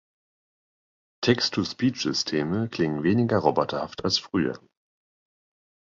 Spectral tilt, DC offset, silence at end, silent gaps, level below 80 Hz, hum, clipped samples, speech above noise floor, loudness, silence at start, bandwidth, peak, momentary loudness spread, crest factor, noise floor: -5 dB/octave; under 0.1%; 1.35 s; none; -58 dBFS; none; under 0.1%; over 65 dB; -25 LUFS; 1.2 s; 7.6 kHz; -4 dBFS; 6 LU; 22 dB; under -90 dBFS